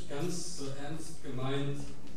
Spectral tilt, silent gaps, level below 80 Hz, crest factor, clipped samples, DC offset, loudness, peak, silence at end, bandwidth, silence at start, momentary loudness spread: -5 dB/octave; none; -56 dBFS; 14 dB; under 0.1%; 3%; -39 LUFS; -22 dBFS; 0 s; 15 kHz; 0 s; 8 LU